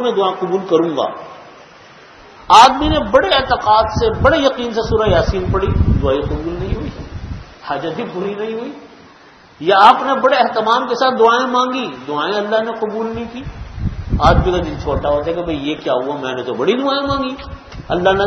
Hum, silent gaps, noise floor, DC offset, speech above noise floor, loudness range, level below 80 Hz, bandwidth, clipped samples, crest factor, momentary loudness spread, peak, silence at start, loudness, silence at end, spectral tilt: none; none; -44 dBFS; under 0.1%; 29 dB; 7 LU; -30 dBFS; 12 kHz; 0.2%; 16 dB; 15 LU; 0 dBFS; 0 s; -15 LUFS; 0 s; -5.5 dB/octave